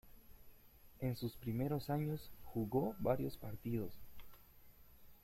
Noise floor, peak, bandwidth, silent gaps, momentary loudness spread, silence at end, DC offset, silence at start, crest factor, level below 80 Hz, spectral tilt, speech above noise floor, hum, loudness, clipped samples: -62 dBFS; -22 dBFS; 16.5 kHz; none; 17 LU; 0.05 s; under 0.1%; 0.05 s; 20 dB; -62 dBFS; -8 dB/octave; 22 dB; none; -42 LUFS; under 0.1%